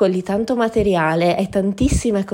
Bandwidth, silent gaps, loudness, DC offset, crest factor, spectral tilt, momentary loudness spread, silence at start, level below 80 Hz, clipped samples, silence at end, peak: 16 kHz; none; -18 LUFS; under 0.1%; 14 dB; -6 dB/octave; 3 LU; 0 s; -32 dBFS; under 0.1%; 0 s; -4 dBFS